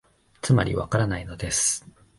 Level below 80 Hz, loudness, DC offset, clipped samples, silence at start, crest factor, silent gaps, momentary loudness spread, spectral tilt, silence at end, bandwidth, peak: -44 dBFS; -24 LUFS; under 0.1%; under 0.1%; 0.45 s; 18 dB; none; 9 LU; -4.5 dB/octave; 0.4 s; 11.5 kHz; -8 dBFS